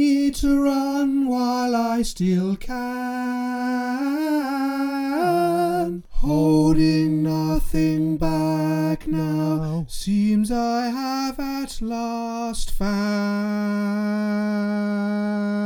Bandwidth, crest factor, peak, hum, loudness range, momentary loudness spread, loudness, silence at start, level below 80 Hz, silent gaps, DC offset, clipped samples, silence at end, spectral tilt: 19.5 kHz; 14 dB; -6 dBFS; none; 4 LU; 8 LU; -22 LUFS; 0 s; -34 dBFS; none; under 0.1%; under 0.1%; 0 s; -6.5 dB/octave